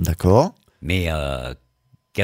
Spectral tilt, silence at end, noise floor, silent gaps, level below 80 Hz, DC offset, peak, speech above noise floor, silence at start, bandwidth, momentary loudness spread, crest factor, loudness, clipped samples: -6.5 dB/octave; 0 s; -61 dBFS; none; -34 dBFS; under 0.1%; -2 dBFS; 41 dB; 0 s; 16 kHz; 16 LU; 20 dB; -21 LUFS; under 0.1%